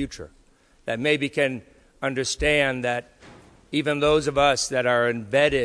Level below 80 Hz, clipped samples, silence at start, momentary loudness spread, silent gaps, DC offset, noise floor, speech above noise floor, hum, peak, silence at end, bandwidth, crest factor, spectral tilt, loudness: -44 dBFS; under 0.1%; 0 s; 11 LU; none; under 0.1%; -57 dBFS; 35 dB; none; -6 dBFS; 0 s; 11 kHz; 18 dB; -4 dB/octave; -23 LUFS